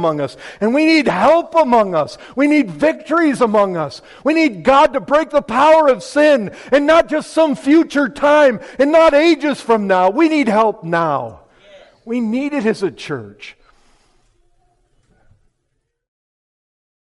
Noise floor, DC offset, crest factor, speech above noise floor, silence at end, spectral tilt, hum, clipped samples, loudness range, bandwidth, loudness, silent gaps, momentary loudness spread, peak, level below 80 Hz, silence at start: -70 dBFS; under 0.1%; 12 dB; 56 dB; 3.5 s; -5.5 dB/octave; none; under 0.1%; 11 LU; 11.5 kHz; -14 LUFS; none; 11 LU; -4 dBFS; -50 dBFS; 0 s